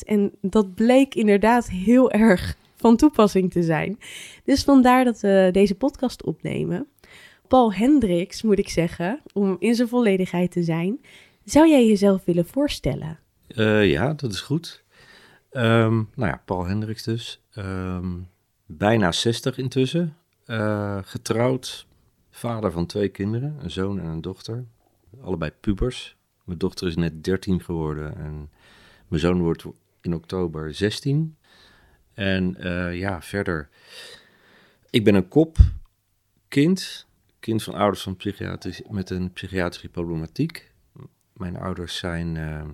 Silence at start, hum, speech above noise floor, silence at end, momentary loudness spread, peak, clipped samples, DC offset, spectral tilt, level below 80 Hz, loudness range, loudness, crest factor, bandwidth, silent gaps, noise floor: 0 s; none; 47 dB; 0 s; 16 LU; 0 dBFS; under 0.1%; under 0.1%; -6.5 dB/octave; -38 dBFS; 10 LU; -22 LUFS; 22 dB; 15 kHz; none; -68 dBFS